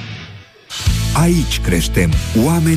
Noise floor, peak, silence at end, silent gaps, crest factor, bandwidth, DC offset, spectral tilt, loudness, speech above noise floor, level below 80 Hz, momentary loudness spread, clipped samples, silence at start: -36 dBFS; -2 dBFS; 0 s; none; 12 dB; 15.5 kHz; under 0.1%; -5.5 dB/octave; -15 LUFS; 23 dB; -24 dBFS; 16 LU; under 0.1%; 0 s